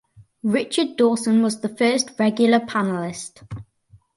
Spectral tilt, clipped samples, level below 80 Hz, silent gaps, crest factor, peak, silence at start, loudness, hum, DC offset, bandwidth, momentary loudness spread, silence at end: -4.5 dB/octave; under 0.1%; -58 dBFS; none; 18 dB; -4 dBFS; 0.2 s; -20 LUFS; none; under 0.1%; 11.5 kHz; 17 LU; 0.55 s